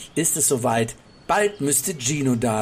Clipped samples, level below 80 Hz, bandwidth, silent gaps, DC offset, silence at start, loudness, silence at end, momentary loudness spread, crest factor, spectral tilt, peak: under 0.1%; -52 dBFS; 16 kHz; none; under 0.1%; 0 s; -21 LUFS; 0 s; 6 LU; 14 dB; -3.5 dB/octave; -8 dBFS